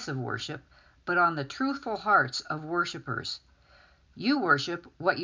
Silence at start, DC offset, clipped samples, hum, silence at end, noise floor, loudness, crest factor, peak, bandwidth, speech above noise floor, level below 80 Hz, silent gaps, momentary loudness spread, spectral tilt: 0 s; under 0.1%; under 0.1%; none; 0 s; -59 dBFS; -28 LUFS; 22 dB; -8 dBFS; 7.6 kHz; 30 dB; -64 dBFS; none; 12 LU; -4.5 dB/octave